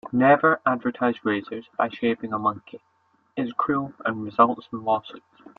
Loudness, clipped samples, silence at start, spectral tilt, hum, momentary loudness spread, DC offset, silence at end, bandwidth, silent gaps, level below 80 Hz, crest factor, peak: -24 LUFS; under 0.1%; 0.05 s; -9 dB/octave; none; 12 LU; under 0.1%; 0.4 s; 4.8 kHz; none; -68 dBFS; 22 dB; -2 dBFS